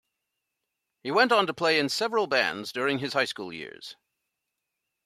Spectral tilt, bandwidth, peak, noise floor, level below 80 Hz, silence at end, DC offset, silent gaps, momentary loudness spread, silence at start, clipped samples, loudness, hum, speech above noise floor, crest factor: -3.5 dB/octave; 14.5 kHz; -8 dBFS; -83 dBFS; -76 dBFS; 1.1 s; under 0.1%; none; 17 LU; 1.05 s; under 0.1%; -25 LUFS; none; 57 dB; 22 dB